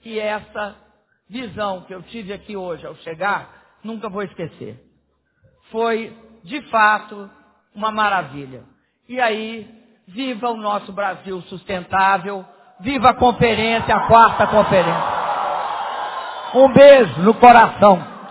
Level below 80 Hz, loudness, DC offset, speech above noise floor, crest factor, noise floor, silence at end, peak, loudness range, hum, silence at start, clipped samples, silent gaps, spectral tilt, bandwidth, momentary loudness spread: -48 dBFS; -15 LUFS; under 0.1%; 48 dB; 18 dB; -64 dBFS; 0 s; 0 dBFS; 15 LU; none; 0.05 s; under 0.1%; none; -9.5 dB/octave; 4 kHz; 22 LU